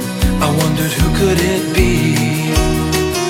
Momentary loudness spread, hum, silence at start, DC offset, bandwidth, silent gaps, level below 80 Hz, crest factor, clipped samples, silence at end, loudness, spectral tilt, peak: 2 LU; none; 0 s; under 0.1%; 17 kHz; none; -22 dBFS; 14 dB; under 0.1%; 0 s; -15 LUFS; -5 dB/octave; 0 dBFS